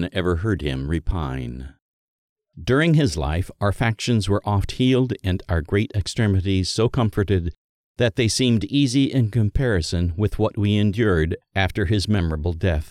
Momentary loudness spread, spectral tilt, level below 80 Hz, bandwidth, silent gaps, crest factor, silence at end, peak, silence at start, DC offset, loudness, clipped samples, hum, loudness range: 6 LU; -6 dB/octave; -34 dBFS; 13 kHz; 1.82-2.36 s, 7.58-7.95 s; 16 dB; 0.05 s; -6 dBFS; 0 s; under 0.1%; -21 LUFS; under 0.1%; none; 3 LU